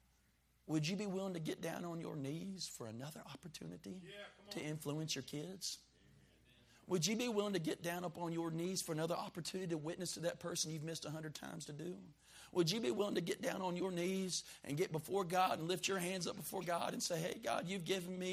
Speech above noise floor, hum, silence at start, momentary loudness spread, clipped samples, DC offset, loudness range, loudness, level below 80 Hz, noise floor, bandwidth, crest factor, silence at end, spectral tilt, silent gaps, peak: 33 dB; none; 0.65 s; 13 LU; under 0.1%; under 0.1%; 7 LU; -42 LUFS; -76 dBFS; -75 dBFS; 15.5 kHz; 22 dB; 0 s; -4 dB/octave; none; -22 dBFS